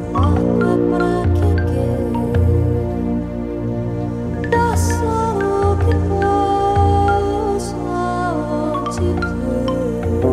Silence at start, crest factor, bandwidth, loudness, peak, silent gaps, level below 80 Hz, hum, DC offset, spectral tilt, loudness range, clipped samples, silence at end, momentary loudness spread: 0 s; 14 dB; 13 kHz; -18 LUFS; -2 dBFS; none; -28 dBFS; 60 Hz at -45 dBFS; under 0.1%; -7.5 dB/octave; 3 LU; under 0.1%; 0 s; 7 LU